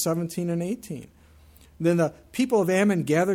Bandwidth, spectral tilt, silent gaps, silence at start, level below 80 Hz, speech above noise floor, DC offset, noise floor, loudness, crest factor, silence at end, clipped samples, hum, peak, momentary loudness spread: 16.5 kHz; -6 dB/octave; none; 0 s; -58 dBFS; 29 dB; under 0.1%; -53 dBFS; -25 LUFS; 16 dB; 0 s; under 0.1%; none; -10 dBFS; 11 LU